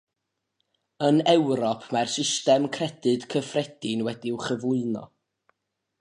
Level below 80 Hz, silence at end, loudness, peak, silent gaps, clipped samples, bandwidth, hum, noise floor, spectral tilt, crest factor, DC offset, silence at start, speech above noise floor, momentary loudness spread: -72 dBFS; 0.95 s; -25 LUFS; -6 dBFS; none; under 0.1%; 11.5 kHz; none; -82 dBFS; -4.5 dB/octave; 20 dB; under 0.1%; 1 s; 57 dB; 9 LU